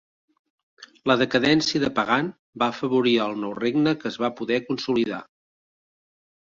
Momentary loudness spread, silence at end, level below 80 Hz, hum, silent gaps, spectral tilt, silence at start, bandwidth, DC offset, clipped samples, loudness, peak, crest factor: 8 LU; 1.25 s; -62 dBFS; none; 2.39-2.53 s; -5 dB/octave; 0.8 s; 7.6 kHz; under 0.1%; under 0.1%; -23 LUFS; -4 dBFS; 20 dB